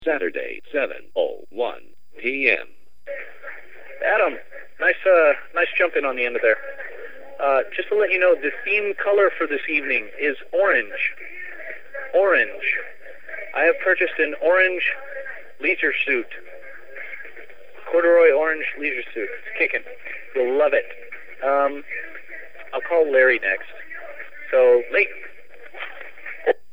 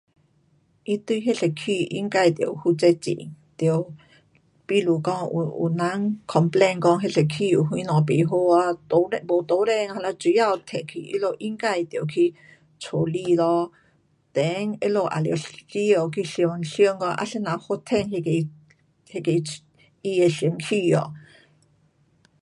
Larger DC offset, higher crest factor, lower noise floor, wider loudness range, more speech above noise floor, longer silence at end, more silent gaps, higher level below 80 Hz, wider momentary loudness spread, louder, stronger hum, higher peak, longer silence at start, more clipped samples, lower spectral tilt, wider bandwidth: first, 2% vs under 0.1%; about the same, 20 dB vs 18 dB; second, -45 dBFS vs -63 dBFS; about the same, 4 LU vs 4 LU; second, 25 dB vs 41 dB; second, 0.2 s vs 1.2 s; neither; about the same, -68 dBFS vs -66 dBFS; first, 20 LU vs 9 LU; first, -20 LUFS vs -23 LUFS; neither; about the same, -2 dBFS vs -4 dBFS; second, 0 s vs 0.9 s; neither; second, -5 dB/octave vs -6.5 dB/octave; second, 5.2 kHz vs 11.5 kHz